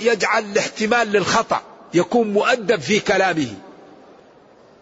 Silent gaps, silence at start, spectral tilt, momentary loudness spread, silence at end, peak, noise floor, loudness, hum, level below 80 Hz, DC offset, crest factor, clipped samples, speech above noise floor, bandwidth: none; 0 s; -4 dB/octave; 7 LU; 1.1 s; -4 dBFS; -49 dBFS; -19 LUFS; none; -58 dBFS; under 0.1%; 16 dB; under 0.1%; 30 dB; 8 kHz